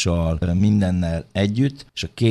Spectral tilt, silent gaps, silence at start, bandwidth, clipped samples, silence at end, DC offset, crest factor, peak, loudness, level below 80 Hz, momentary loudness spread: -6.5 dB/octave; none; 0 s; 12 kHz; under 0.1%; 0 s; under 0.1%; 14 dB; -6 dBFS; -21 LUFS; -36 dBFS; 7 LU